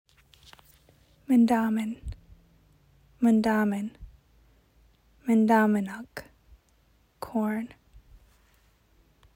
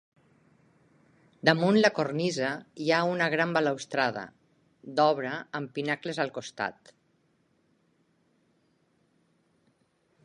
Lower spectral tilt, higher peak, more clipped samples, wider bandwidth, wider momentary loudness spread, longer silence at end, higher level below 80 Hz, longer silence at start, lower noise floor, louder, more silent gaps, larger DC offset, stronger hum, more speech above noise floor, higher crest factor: first, -7 dB/octave vs -5 dB/octave; second, -10 dBFS vs -4 dBFS; neither; first, 16 kHz vs 11.5 kHz; first, 21 LU vs 12 LU; second, 1.7 s vs 3.55 s; first, -54 dBFS vs -76 dBFS; second, 1.3 s vs 1.45 s; second, -64 dBFS vs -70 dBFS; about the same, -26 LUFS vs -28 LUFS; neither; neither; neither; about the same, 40 dB vs 43 dB; second, 20 dB vs 28 dB